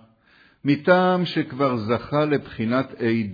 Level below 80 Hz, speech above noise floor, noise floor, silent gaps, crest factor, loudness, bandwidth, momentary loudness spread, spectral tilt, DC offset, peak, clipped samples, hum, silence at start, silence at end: -58 dBFS; 35 dB; -57 dBFS; none; 18 dB; -22 LUFS; 5 kHz; 7 LU; -8.5 dB/octave; under 0.1%; -4 dBFS; under 0.1%; none; 0.65 s; 0 s